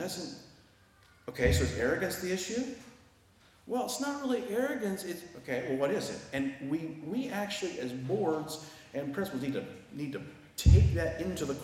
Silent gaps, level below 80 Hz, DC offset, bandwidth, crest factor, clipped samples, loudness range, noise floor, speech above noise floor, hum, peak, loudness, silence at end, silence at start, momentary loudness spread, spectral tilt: none; -42 dBFS; under 0.1%; 16 kHz; 22 dB; under 0.1%; 4 LU; -62 dBFS; 31 dB; none; -10 dBFS; -33 LUFS; 0 s; 0 s; 13 LU; -5.5 dB/octave